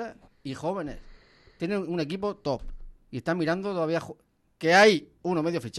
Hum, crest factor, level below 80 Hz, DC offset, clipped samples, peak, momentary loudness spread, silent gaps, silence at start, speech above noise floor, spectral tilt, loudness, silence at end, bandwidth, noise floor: none; 20 dB; -50 dBFS; under 0.1%; under 0.1%; -8 dBFS; 20 LU; none; 0 s; 28 dB; -5 dB/octave; -26 LUFS; 0 s; 12.5 kHz; -54 dBFS